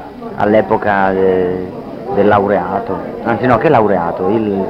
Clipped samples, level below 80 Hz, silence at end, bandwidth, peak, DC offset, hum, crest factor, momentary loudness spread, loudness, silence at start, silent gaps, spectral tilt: under 0.1%; -42 dBFS; 0 s; 6.2 kHz; 0 dBFS; under 0.1%; none; 14 dB; 10 LU; -14 LUFS; 0 s; none; -9 dB/octave